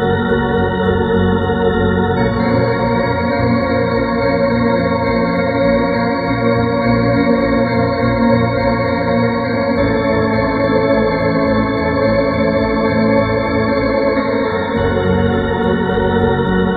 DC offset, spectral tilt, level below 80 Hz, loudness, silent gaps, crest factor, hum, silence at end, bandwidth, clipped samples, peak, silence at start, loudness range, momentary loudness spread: under 0.1%; -9.5 dB/octave; -32 dBFS; -15 LUFS; none; 12 dB; none; 0 s; 4.9 kHz; under 0.1%; -2 dBFS; 0 s; 1 LU; 2 LU